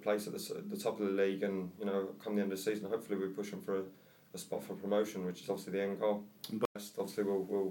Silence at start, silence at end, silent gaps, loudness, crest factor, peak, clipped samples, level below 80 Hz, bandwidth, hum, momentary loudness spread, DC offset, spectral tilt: 0 s; 0 s; 6.65-6.75 s; -38 LUFS; 18 dB; -18 dBFS; under 0.1%; -82 dBFS; 17 kHz; none; 8 LU; under 0.1%; -5.5 dB/octave